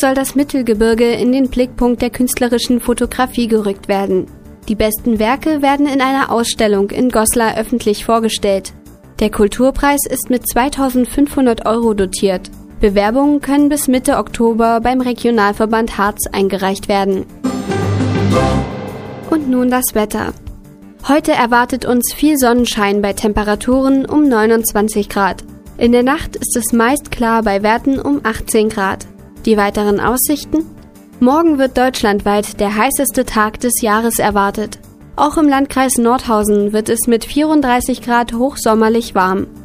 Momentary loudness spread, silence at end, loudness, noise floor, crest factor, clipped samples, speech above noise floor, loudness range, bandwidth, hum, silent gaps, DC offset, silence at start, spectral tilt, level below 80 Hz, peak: 6 LU; 0 s; -14 LUFS; -37 dBFS; 14 dB; under 0.1%; 23 dB; 2 LU; 15.5 kHz; none; none; under 0.1%; 0 s; -4.5 dB/octave; -34 dBFS; 0 dBFS